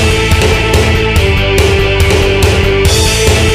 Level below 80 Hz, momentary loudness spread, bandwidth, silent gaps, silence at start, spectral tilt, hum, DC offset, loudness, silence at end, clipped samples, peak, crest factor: -16 dBFS; 1 LU; 16 kHz; none; 0 s; -4.5 dB/octave; none; under 0.1%; -9 LUFS; 0 s; under 0.1%; 0 dBFS; 8 dB